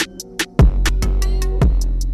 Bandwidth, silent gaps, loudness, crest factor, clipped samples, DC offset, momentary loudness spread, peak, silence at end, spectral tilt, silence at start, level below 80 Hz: 14 kHz; none; -19 LUFS; 12 dB; under 0.1%; under 0.1%; 7 LU; -4 dBFS; 0 s; -5 dB/octave; 0 s; -16 dBFS